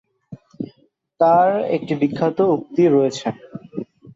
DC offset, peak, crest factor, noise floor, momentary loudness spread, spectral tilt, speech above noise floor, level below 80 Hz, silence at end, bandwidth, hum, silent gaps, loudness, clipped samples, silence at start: under 0.1%; -4 dBFS; 16 dB; -60 dBFS; 18 LU; -7 dB/octave; 43 dB; -62 dBFS; 0.05 s; 8 kHz; none; none; -18 LUFS; under 0.1%; 0.3 s